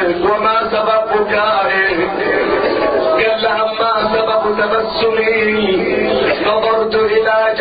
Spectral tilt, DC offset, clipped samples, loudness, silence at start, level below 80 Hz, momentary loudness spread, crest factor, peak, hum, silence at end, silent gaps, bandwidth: -8 dB/octave; under 0.1%; under 0.1%; -14 LUFS; 0 s; -44 dBFS; 2 LU; 12 dB; -2 dBFS; none; 0 s; none; 5 kHz